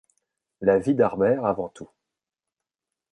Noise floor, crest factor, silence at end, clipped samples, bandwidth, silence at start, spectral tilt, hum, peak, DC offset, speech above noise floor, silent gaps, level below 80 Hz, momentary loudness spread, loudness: -88 dBFS; 20 dB; 1.25 s; under 0.1%; 10.5 kHz; 0.6 s; -8.5 dB/octave; none; -6 dBFS; under 0.1%; 66 dB; none; -60 dBFS; 9 LU; -23 LUFS